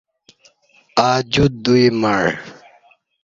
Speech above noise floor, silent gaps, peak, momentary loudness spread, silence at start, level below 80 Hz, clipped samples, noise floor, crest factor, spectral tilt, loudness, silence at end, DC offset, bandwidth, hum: 39 dB; none; 0 dBFS; 9 LU; 0.95 s; -44 dBFS; under 0.1%; -54 dBFS; 18 dB; -5.5 dB/octave; -16 LUFS; 0.7 s; under 0.1%; 7.6 kHz; none